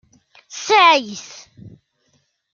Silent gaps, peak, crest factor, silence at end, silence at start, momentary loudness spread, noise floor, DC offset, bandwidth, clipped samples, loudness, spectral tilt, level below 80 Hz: none; 0 dBFS; 20 dB; 0.85 s; 0.55 s; 24 LU; -65 dBFS; under 0.1%; 7.4 kHz; under 0.1%; -13 LUFS; -1.5 dB/octave; -68 dBFS